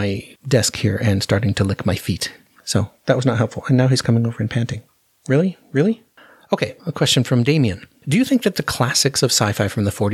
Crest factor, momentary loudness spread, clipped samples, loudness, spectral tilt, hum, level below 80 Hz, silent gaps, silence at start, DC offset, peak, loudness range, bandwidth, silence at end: 18 dB; 9 LU; under 0.1%; -19 LUFS; -5 dB/octave; none; -50 dBFS; none; 0 s; under 0.1%; 0 dBFS; 3 LU; 15.5 kHz; 0 s